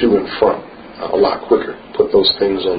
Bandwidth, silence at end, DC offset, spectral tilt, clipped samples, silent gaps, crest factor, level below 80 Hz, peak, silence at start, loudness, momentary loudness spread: 5 kHz; 0 s; under 0.1%; -9.5 dB/octave; under 0.1%; none; 16 dB; -46 dBFS; 0 dBFS; 0 s; -15 LUFS; 13 LU